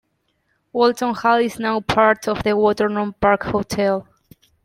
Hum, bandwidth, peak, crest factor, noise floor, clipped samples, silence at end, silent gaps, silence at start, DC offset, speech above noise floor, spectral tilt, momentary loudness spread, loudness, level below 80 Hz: none; 16 kHz; -2 dBFS; 18 dB; -68 dBFS; under 0.1%; 0.65 s; none; 0.75 s; under 0.1%; 50 dB; -5.5 dB/octave; 6 LU; -19 LUFS; -48 dBFS